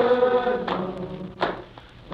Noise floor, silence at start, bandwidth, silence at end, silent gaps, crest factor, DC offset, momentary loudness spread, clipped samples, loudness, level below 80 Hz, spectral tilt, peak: -44 dBFS; 0 s; 5.8 kHz; 0 s; none; 18 dB; under 0.1%; 16 LU; under 0.1%; -25 LUFS; -52 dBFS; -7.5 dB/octave; -8 dBFS